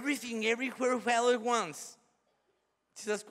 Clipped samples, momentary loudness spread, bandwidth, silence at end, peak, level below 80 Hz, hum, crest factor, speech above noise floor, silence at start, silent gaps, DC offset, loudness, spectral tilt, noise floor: under 0.1%; 15 LU; 15.5 kHz; 0 s; -16 dBFS; -88 dBFS; none; 18 dB; 46 dB; 0 s; none; under 0.1%; -31 LUFS; -2.5 dB/octave; -77 dBFS